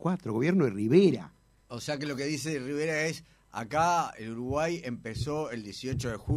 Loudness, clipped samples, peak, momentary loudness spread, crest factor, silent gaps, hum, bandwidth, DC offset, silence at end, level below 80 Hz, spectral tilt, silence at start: -30 LUFS; under 0.1%; -10 dBFS; 14 LU; 20 dB; none; none; 14.5 kHz; under 0.1%; 0 s; -54 dBFS; -6 dB/octave; 0 s